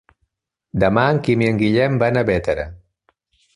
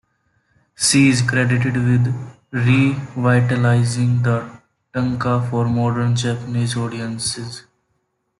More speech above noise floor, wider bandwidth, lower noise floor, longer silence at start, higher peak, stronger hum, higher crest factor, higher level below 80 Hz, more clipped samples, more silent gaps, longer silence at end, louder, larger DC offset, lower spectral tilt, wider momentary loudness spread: about the same, 55 dB vs 52 dB; about the same, 11 kHz vs 12 kHz; about the same, -72 dBFS vs -69 dBFS; about the same, 0.75 s vs 0.8 s; about the same, -2 dBFS vs -4 dBFS; neither; about the same, 18 dB vs 16 dB; first, -42 dBFS vs -52 dBFS; neither; neither; about the same, 0.8 s vs 0.8 s; about the same, -18 LUFS vs -18 LUFS; neither; first, -8 dB/octave vs -5.5 dB/octave; about the same, 9 LU vs 10 LU